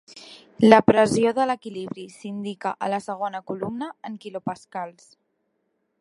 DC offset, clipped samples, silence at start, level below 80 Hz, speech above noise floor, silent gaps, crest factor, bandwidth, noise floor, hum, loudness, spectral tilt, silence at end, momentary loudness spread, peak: under 0.1%; under 0.1%; 0.1 s; -60 dBFS; 51 dB; none; 24 dB; 11.5 kHz; -73 dBFS; none; -22 LUFS; -5.5 dB/octave; 1.1 s; 20 LU; 0 dBFS